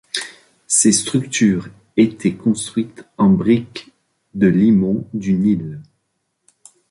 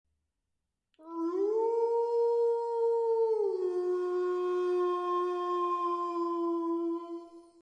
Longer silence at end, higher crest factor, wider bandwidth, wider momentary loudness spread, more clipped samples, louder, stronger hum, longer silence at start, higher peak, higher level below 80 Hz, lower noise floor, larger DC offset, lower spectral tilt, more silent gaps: first, 1.1 s vs 0.2 s; about the same, 16 dB vs 12 dB; first, 11.5 kHz vs 8.8 kHz; first, 18 LU vs 6 LU; neither; first, -17 LUFS vs -31 LUFS; neither; second, 0.15 s vs 1 s; first, -2 dBFS vs -20 dBFS; first, -52 dBFS vs -90 dBFS; second, -71 dBFS vs -85 dBFS; neither; about the same, -5 dB/octave vs -4.5 dB/octave; neither